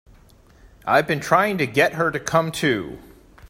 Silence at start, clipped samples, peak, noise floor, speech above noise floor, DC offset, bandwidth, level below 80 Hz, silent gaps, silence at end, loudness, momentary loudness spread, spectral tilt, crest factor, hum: 0.85 s; under 0.1%; -2 dBFS; -51 dBFS; 31 dB; under 0.1%; 16 kHz; -52 dBFS; none; 0.05 s; -20 LUFS; 7 LU; -5 dB/octave; 20 dB; none